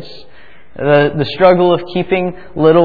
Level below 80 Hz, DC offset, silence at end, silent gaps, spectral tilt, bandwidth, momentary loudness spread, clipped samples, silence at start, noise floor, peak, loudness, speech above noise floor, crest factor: -46 dBFS; 2%; 0 s; none; -9 dB/octave; 4.9 kHz; 8 LU; 0.1%; 0 s; -44 dBFS; 0 dBFS; -13 LUFS; 32 dB; 14 dB